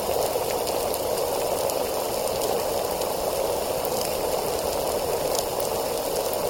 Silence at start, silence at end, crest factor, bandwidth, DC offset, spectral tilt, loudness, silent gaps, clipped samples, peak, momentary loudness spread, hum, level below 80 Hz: 0 s; 0 s; 20 dB; 17 kHz; under 0.1%; -3 dB/octave; -26 LUFS; none; under 0.1%; -6 dBFS; 1 LU; none; -46 dBFS